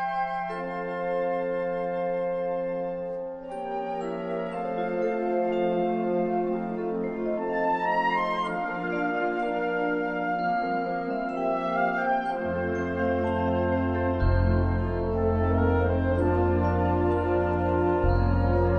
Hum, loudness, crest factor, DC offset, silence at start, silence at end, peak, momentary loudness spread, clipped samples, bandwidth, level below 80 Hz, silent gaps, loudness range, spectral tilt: none; -27 LUFS; 14 dB; under 0.1%; 0 s; 0 s; -12 dBFS; 7 LU; under 0.1%; 5.6 kHz; -38 dBFS; none; 5 LU; -9 dB/octave